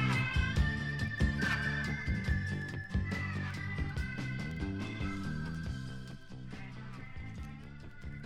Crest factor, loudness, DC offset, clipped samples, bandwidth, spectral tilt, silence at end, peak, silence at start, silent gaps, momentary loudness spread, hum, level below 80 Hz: 18 dB; -36 LUFS; under 0.1%; under 0.1%; 13 kHz; -6 dB/octave; 0 s; -18 dBFS; 0 s; none; 15 LU; none; -42 dBFS